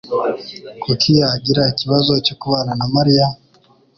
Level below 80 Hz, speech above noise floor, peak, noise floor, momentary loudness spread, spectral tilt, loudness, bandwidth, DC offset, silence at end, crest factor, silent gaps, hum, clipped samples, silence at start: -48 dBFS; 37 dB; -2 dBFS; -53 dBFS; 13 LU; -6.5 dB/octave; -16 LUFS; 6.8 kHz; under 0.1%; 0.6 s; 14 dB; none; none; under 0.1%; 0.05 s